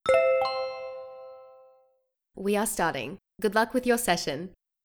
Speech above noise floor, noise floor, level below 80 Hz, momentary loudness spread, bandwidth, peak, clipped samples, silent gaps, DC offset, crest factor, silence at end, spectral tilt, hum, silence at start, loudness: 45 dB; -72 dBFS; -58 dBFS; 18 LU; over 20 kHz; -10 dBFS; under 0.1%; none; under 0.1%; 18 dB; 0.35 s; -3.5 dB/octave; none; 0.05 s; -27 LUFS